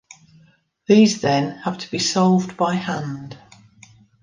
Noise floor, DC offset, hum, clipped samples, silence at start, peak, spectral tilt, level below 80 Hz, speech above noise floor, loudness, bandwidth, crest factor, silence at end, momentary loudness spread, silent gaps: -56 dBFS; under 0.1%; none; under 0.1%; 0.9 s; -2 dBFS; -5 dB/octave; -62 dBFS; 38 dB; -19 LUFS; 9.8 kHz; 18 dB; 0.85 s; 17 LU; none